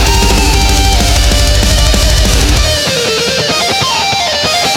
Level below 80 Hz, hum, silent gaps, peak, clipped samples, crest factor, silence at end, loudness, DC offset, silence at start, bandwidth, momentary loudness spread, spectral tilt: -12 dBFS; none; none; 0 dBFS; under 0.1%; 10 dB; 0 s; -9 LUFS; under 0.1%; 0 s; 17.5 kHz; 2 LU; -3 dB/octave